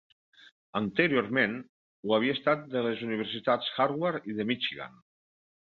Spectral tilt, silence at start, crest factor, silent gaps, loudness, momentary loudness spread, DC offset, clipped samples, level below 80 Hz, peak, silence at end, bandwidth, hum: -7.5 dB/octave; 0.75 s; 22 dB; 1.69-2.03 s; -29 LUFS; 10 LU; under 0.1%; under 0.1%; -70 dBFS; -8 dBFS; 0.9 s; 6.2 kHz; none